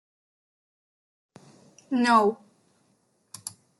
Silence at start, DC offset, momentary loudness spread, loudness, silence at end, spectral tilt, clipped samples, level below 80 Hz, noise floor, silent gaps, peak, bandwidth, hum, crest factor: 1.9 s; under 0.1%; 24 LU; -23 LUFS; 0.3 s; -4 dB/octave; under 0.1%; -80 dBFS; -68 dBFS; none; -8 dBFS; 12.5 kHz; none; 22 dB